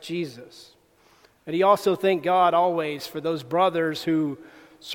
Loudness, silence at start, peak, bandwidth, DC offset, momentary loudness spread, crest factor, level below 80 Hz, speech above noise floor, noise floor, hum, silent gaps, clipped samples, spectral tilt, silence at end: -23 LUFS; 0 s; -6 dBFS; 19 kHz; under 0.1%; 17 LU; 18 dB; -70 dBFS; 36 dB; -59 dBFS; none; none; under 0.1%; -5.5 dB/octave; 0 s